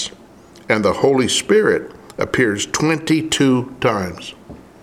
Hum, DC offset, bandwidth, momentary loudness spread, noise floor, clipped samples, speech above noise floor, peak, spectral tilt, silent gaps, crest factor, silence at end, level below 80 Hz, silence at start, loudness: none; under 0.1%; 15.5 kHz; 13 LU; -43 dBFS; under 0.1%; 26 dB; 0 dBFS; -4 dB/octave; none; 18 dB; 0.25 s; -50 dBFS; 0 s; -17 LUFS